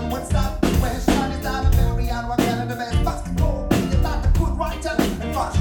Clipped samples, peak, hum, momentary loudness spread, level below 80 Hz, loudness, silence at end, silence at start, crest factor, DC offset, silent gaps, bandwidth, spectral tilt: under 0.1%; -2 dBFS; none; 4 LU; -24 dBFS; -22 LUFS; 0 s; 0 s; 18 dB; under 0.1%; none; 18.5 kHz; -6 dB/octave